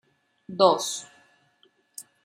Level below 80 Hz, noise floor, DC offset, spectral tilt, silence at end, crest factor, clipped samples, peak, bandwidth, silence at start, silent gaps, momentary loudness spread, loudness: -82 dBFS; -65 dBFS; under 0.1%; -3.5 dB/octave; 0.25 s; 24 dB; under 0.1%; -4 dBFS; 15.5 kHz; 0.5 s; none; 23 LU; -23 LUFS